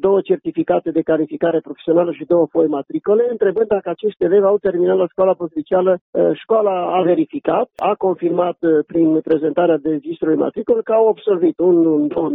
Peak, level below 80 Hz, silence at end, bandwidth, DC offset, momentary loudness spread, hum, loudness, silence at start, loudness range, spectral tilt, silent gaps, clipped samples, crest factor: -4 dBFS; -58 dBFS; 0 s; 3.9 kHz; under 0.1%; 5 LU; none; -17 LUFS; 0 s; 1 LU; -10.5 dB/octave; 6.01-6.13 s; under 0.1%; 12 dB